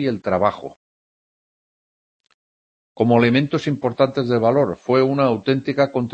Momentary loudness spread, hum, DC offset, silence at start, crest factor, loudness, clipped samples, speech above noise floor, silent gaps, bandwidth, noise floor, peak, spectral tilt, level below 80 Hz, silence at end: 6 LU; none; under 0.1%; 0 s; 18 dB; -19 LUFS; under 0.1%; over 72 dB; 0.76-2.20 s, 2.34-2.95 s; 8.4 kHz; under -90 dBFS; -2 dBFS; -8 dB/octave; -60 dBFS; 0 s